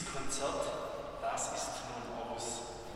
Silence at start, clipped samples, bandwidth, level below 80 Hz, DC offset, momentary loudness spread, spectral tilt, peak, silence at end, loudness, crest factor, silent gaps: 0 s; under 0.1%; 16 kHz; -56 dBFS; under 0.1%; 6 LU; -2.5 dB/octave; -22 dBFS; 0 s; -39 LUFS; 16 dB; none